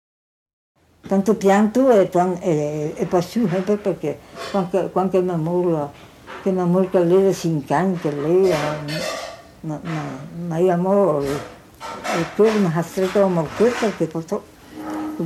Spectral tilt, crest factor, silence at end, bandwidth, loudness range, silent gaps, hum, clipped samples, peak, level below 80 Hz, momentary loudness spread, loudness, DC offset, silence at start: -6.5 dB/octave; 16 dB; 0 s; 14.5 kHz; 3 LU; none; none; under 0.1%; -4 dBFS; -54 dBFS; 15 LU; -20 LUFS; under 0.1%; 1.05 s